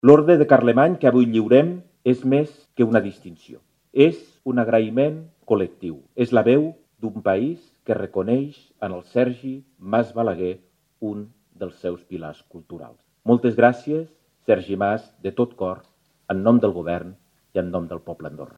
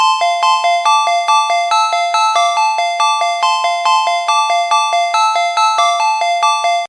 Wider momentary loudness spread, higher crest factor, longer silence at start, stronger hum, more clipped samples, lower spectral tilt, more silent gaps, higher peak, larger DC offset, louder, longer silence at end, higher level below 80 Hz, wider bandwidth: first, 19 LU vs 2 LU; first, 20 dB vs 12 dB; about the same, 0.05 s vs 0 s; neither; neither; first, -8.5 dB/octave vs 4.5 dB/octave; neither; about the same, 0 dBFS vs 0 dBFS; neither; second, -21 LUFS vs -13 LUFS; about the same, 0.1 s vs 0 s; first, -62 dBFS vs under -90 dBFS; second, 7.4 kHz vs 11 kHz